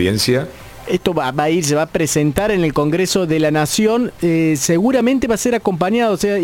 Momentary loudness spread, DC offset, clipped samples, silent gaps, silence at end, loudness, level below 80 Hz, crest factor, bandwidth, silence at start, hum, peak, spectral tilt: 3 LU; under 0.1%; under 0.1%; none; 0 s; -16 LUFS; -42 dBFS; 16 dB; 17 kHz; 0 s; none; 0 dBFS; -5 dB/octave